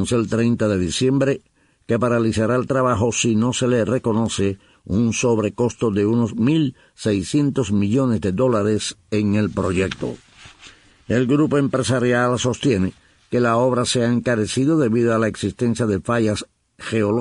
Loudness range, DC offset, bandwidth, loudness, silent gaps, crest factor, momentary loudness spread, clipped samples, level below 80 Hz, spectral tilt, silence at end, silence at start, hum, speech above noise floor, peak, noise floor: 2 LU; under 0.1%; 11 kHz; -20 LUFS; none; 14 dB; 6 LU; under 0.1%; -48 dBFS; -5.5 dB/octave; 0 s; 0 s; none; 28 dB; -6 dBFS; -47 dBFS